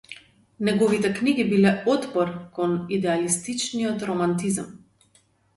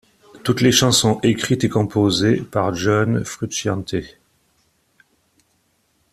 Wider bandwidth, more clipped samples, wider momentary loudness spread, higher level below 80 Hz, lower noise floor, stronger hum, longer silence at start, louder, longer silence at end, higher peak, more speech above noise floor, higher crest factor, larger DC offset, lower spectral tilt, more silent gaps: second, 11.5 kHz vs 14.5 kHz; neither; about the same, 8 LU vs 10 LU; second, -62 dBFS vs -50 dBFS; about the same, -62 dBFS vs -64 dBFS; neither; second, 0.1 s vs 0.35 s; second, -23 LUFS vs -18 LUFS; second, 0.8 s vs 2.05 s; second, -6 dBFS vs -2 dBFS; second, 39 dB vs 46 dB; about the same, 18 dB vs 18 dB; neither; about the same, -5 dB/octave vs -4.5 dB/octave; neither